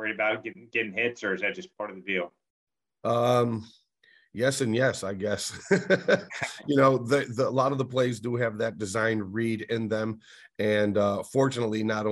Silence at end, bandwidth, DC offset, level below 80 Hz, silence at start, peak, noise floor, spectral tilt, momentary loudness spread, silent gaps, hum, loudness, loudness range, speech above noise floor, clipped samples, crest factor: 0 s; 12.5 kHz; under 0.1%; -68 dBFS; 0 s; -8 dBFS; -63 dBFS; -5.5 dB/octave; 10 LU; 2.50-2.67 s; none; -27 LUFS; 4 LU; 36 dB; under 0.1%; 20 dB